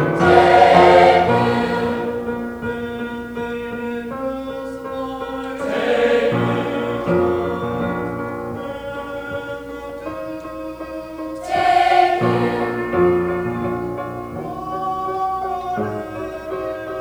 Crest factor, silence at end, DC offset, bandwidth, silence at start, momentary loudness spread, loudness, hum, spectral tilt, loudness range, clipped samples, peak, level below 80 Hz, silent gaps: 18 dB; 0 s; under 0.1%; over 20 kHz; 0 s; 16 LU; -19 LUFS; none; -6.5 dB/octave; 10 LU; under 0.1%; 0 dBFS; -46 dBFS; none